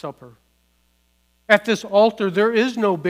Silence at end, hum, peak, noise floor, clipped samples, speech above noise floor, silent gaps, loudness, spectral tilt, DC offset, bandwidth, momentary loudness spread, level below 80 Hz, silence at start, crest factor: 0 s; 60 Hz at -60 dBFS; 0 dBFS; -63 dBFS; under 0.1%; 45 dB; none; -18 LUFS; -5 dB/octave; under 0.1%; 15.5 kHz; 3 LU; -66 dBFS; 0.05 s; 20 dB